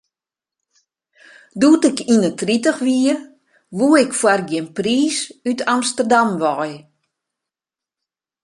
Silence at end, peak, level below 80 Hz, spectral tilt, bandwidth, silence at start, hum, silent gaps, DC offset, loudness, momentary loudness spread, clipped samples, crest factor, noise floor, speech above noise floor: 1.65 s; -2 dBFS; -64 dBFS; -4 dB/octave; 11.5 kHz; 1.55 s; none; none; under 0.1%; -17 LUFS; 10 LU; under 0.1%; 18 dB; -89 dBFS; 72 dB